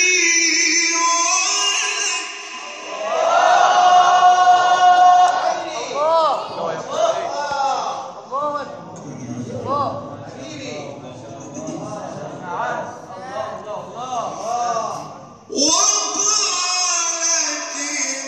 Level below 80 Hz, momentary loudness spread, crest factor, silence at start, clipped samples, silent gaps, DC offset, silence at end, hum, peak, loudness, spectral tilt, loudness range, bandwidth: -64 dBFS; 19 LU; 16 dB; 0 s; under 0.1%; none; under 0.1%; 0 s; none; -2 dBFS; -17 LUFS; -0.5 dB/octave; 14 LU; 12.5 kHz